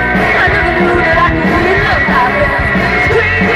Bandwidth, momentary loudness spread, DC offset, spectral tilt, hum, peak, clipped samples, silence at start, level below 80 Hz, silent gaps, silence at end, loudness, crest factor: 14.5 kHz; 2 LU; under 0.1%; -6.5 dB/octave; none; -2 dBFS; under 0.1%; 0 s; -24 dBFS; none; 0 s; -10 LUFS; 10 dB